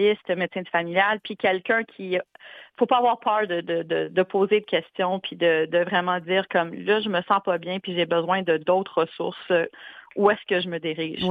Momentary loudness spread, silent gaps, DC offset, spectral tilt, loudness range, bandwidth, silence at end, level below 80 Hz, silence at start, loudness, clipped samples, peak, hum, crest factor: 7 LU; none; under 0.1%; -7.5 dB/octave; 1 LU; 5 kHz; 0 s; -70 dBFS; 0 s; -24 LUFS; under 0.1%; -4 dBFS; none; 18 dB